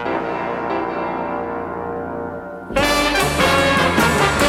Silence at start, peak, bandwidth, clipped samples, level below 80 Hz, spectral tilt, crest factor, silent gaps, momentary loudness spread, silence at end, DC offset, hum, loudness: 0 s; -2 dBFS; 17.5 kHz; under 0.1%; -36 dBFS; -4 dB/octave; 16 dB; none; 11 LU; 0 s; under 0.1%; none; -18 LUFS